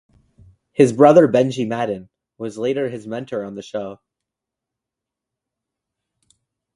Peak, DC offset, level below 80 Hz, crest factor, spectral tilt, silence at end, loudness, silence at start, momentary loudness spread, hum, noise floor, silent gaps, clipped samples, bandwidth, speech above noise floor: 0 dBFS; under 0.1%; -62 dBFS; 20 dB; -7 dB/octave; 2.8 s; -18 LUFS; 0.8 s; 19 LU; none; -85 dBFS; none; under 0.1%; 11.5 kHz; 68 dB